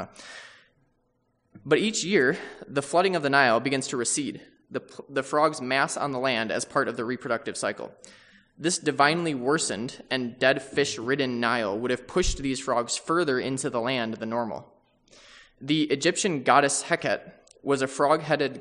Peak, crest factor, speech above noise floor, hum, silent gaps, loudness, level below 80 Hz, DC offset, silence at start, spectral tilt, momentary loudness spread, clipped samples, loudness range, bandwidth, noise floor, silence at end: -4 dBFS; 22 dB; 45 dB; none; none; -25 LUFS; -48 dBFS; under 0.1%; 0 s; -3.5 dB/octave; 13 LU; under 0.1%; 4 LU; 10.5 kHz; -71 dBFS; 0 s